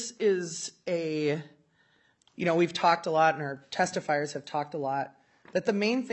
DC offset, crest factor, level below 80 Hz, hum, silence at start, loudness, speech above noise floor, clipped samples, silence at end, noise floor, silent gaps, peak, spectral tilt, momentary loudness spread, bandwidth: under 0.1%; 20 dB; -78 dBFS; none; 0 s; -29 LUFS; 39 dB; under 0.1%; 0 s; -67 dBFS; none; -10 dBFS; -4.5 dB/octave; 10 LU; 8.6 kHz